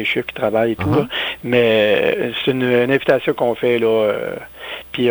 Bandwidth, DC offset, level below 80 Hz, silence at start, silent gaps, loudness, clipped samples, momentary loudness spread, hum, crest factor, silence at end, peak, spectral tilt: over 20 kHz; under 0.1%; -50 dBFS; 0 s; none; -17 LUFS; under 0.1%; 10 LU; none; 16 dB; 0 s; -2 dBFS; -7 dB/octave